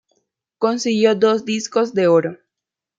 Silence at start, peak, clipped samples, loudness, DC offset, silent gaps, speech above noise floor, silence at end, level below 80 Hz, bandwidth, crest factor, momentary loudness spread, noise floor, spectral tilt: 0.6 s; -2 dBFS; under 0.1%; -18 LUFS; under 0.1%; none; 68 dB; 0.65 s; -68 dBFS; 7.8 kHz; 16 dB; 6 LU; -85 dBFS; -5 dB/octave